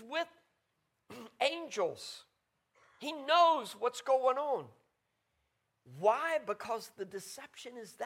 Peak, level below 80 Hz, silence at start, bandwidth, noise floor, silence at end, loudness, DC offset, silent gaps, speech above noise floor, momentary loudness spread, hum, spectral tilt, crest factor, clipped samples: -14 dBFS; -86 dBFS; 0 s; 16.5 kHz; -81 dBFS; 0 s; -33 LUFS; under 0.1%; none; 48 dB; 20 LU; none; -2.5 dB/octave; 22 dB; under 0.1%